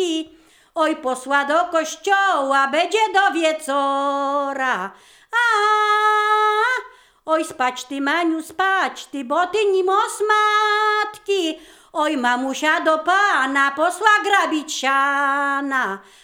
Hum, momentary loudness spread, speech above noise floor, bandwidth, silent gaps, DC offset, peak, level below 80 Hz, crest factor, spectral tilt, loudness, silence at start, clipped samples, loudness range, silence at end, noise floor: none; 8 LU; 31 dB; 19 kHz; none; under 0.1%; 0 dBFS; -68 dBFS; 20 dB; -1.5 dB/octave; -19 LUFS; 0 s; under 0.1%; 2 LU; 0.25 s; -50 dBFS